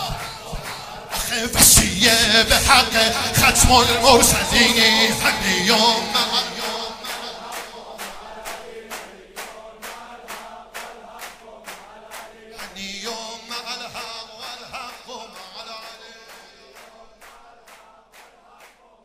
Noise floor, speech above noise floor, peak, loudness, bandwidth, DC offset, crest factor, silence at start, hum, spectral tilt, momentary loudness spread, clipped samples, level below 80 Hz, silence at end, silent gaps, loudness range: -50 dBFS; 34 dB; 0 dBFS; -15 LUFS; 16 kHz; under 0.1%; 22 dB; 0 s; none; -1.5 dB/octave; 24 LU; under 0.1%; -36 dBFS; 1.75 s; none; 23 LU